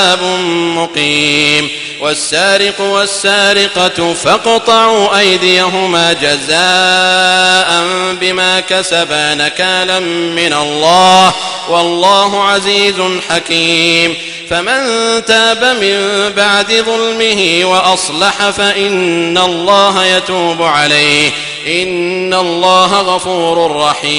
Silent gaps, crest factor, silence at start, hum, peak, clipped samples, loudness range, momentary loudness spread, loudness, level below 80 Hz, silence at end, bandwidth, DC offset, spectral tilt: none; 10 dB; 0 s; none; 0 dBFS; 0.4%; 2 LU; 5 LU; -9 LUFS; -48 dBFS; 0 s; 15.5 kHz; under 0.1%; -2.5 dB/octave